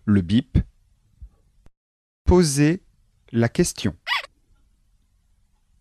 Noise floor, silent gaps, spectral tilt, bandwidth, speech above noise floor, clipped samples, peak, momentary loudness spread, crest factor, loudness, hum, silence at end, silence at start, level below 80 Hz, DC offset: -62 dBFS; 1.77-2.25 s; -5.5 dB/octave; 13 kHz; 43 dB; under 0.1%; -6 dBFS; 11 LU; 18 dB; -22 LUFS; none; 1.6 s; 0.05 s; -36 dBFS; under 0.1%